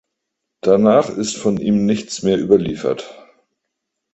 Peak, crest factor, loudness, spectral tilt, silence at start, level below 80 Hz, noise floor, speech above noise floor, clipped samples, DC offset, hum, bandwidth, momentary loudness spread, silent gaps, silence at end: 0 dBFS; 18 dB; -17 LUFS; -6 dB/octave; 0.65 s; -52 dBFS; -78 dBFS; 62 dB; under 0.1%; under 0.1%; none; 8.2 kHz; 10 LU; none; 1 s